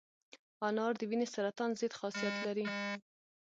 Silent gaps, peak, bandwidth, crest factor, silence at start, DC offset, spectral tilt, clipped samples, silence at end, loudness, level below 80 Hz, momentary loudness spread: 0.39-0.60 s; -22 dBFS; 9 kHz; 16 dB; 0.35 s; under 0.1%; -4.5 dB/octave; under 0.1%; 0.5 s; -37 LUFS; -86 dBFS; 5 LU